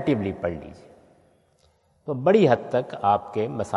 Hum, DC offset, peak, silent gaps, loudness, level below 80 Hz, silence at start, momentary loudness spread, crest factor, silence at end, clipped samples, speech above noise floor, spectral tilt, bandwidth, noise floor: none; under 0.1%; -4 dBFS; none; -23 LUFS; -60 dBFS; 0 s; 18 LU; 20 dB; 0 s; under 0.1%; 40 dB; -7.5 dB/octave; 11.5 kHz; -63 dBFS